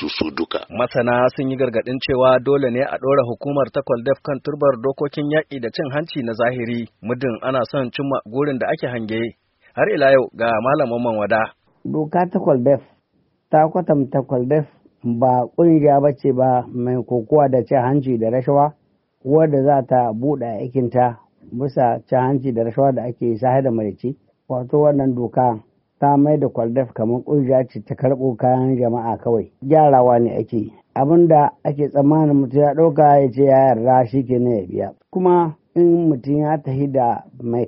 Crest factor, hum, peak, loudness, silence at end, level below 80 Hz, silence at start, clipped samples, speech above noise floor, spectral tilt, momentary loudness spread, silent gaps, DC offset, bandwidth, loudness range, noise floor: 16 dB; none; 0 dBFS; -18 LUFS; 0 s; -56 dBFS; 0 s; under 0.1%; 47 dB; -6.5 dB/octave; 11 LU; none; under 0.1%; 5.8 kHz; 6 LU; -64 dBFS